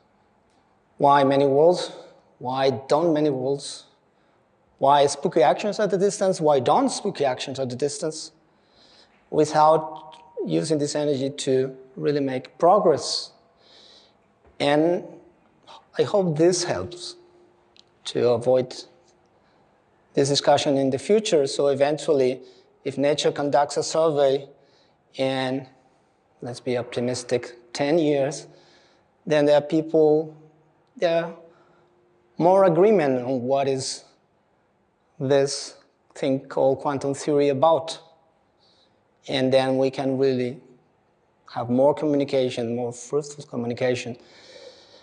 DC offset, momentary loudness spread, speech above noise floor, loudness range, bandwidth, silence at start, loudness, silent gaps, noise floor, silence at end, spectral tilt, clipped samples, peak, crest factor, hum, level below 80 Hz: under 0.1%; 16 LU; 44 dB; 5 LU; 10.5 kHz; 1 s; -22 LUFS; none; -65 dBFS; 0.3 s; -5 dB/octave; under 0.1%; -6 dBFS; 18 dB; none; -72 dBFS